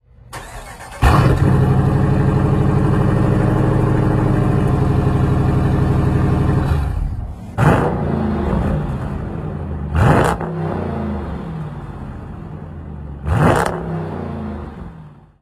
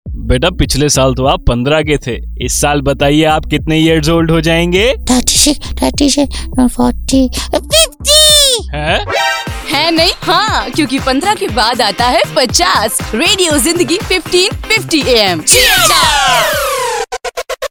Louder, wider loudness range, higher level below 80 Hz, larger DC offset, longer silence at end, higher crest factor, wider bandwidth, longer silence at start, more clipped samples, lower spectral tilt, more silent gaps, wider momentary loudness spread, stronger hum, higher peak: second, -17 LUFS vs -10 LUFS; first, 7 LU vs 3 LU; about the same, -26 dBFS vs -24 dBFS; neither; first, 0.3 s vs 0.05 s; about the same, 16 dB vs 12 dB; second, 13.5 kHz vs over 20 kHz; first, 0.3 s vs 0.05 s; second, under 0.1% vs 0.6%; first, -8 dB/octave vs -3 dB/octave; neither; first, 17 LU vs 9 LU; neither; about the same, 0 dBFS vs 0 dBFS